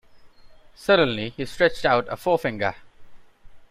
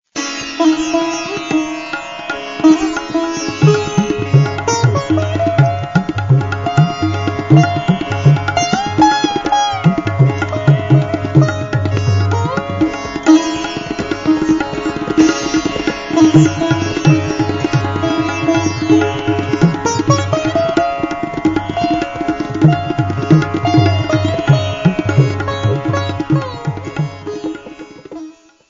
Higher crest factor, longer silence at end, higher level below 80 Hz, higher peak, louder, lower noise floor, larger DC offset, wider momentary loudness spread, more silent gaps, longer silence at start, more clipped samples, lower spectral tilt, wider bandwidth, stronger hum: first, 20 dB vs 14 dB; second, 0.05 s vs 0.4 s; second, -50 dBFS vs -42 dBFS; second, -4 dBFS vs 0 dBFS; second, -23 LUFS vs -15 LUFS; first, -48 dBFS vs -35 dBFS; second, under 0.1% vs 0.3%; about the same, 10 LU vs 9 LU; neither; about the same, 0.15 s vs 0.15 s; neither; about the same, -5.5 dB/octave vs -6.5 dB/octave; first, 15.5 kHz vs 7.6 kHz; neither